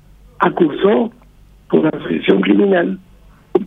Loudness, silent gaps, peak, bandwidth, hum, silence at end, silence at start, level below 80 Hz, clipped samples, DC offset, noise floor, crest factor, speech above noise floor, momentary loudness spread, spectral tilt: -15 LUFS; none; 0 dBFS; 4 kHz; none; 0 s; 0.4 s; -48 dBFS; under 0.1%; under 0.1%; -45 dBFS; 16 dB; 31 dB; 9 LU; -9 dB/octave